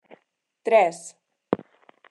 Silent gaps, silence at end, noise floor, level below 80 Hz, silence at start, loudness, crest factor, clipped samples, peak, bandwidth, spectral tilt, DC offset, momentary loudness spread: none; 0.55 s; -70 dBFS; -74 dBFS; 0.65 s; -23 LUFS; 22 dB; under 0.1%; -4 dBFS; 11.5 kHz; -4.5 dB/octave; under 0.1%; 20 LU